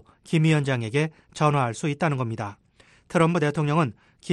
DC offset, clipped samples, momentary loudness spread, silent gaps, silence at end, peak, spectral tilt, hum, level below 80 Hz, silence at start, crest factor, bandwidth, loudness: under 0.1%; under 0.1%; 9 LU; none; 0 s; -8 dBFS; -6.5 dB/octave; none; -62 dBFS; 0.25 s; 18 dB; 11 kHz; -24 LUFS